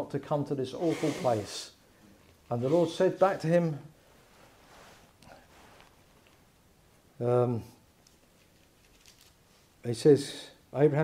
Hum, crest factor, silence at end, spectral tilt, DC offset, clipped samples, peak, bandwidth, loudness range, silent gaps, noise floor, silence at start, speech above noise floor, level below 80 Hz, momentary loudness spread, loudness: none; 22 dB; 0 s; -6.5 dB/octave; under 0.1%; under 0.1%; -10 dBFS; 16 kHz; 6 LU; none; -62 dBFS; 0 s; 35 dB; -68 dBFS; 15 LU; -29 LUFS